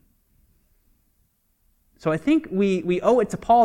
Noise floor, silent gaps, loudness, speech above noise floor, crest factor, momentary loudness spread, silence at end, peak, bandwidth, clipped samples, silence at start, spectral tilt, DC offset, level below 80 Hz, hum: -67 dBFS; none; -22 LUFS; 47 dB; 18 dB; 6 LU; 0 s; -6 dBFS; 13 kHz; under 0.1%; 2.05 s; -7 dB/octave; under 0.1%; -54 dBFS; none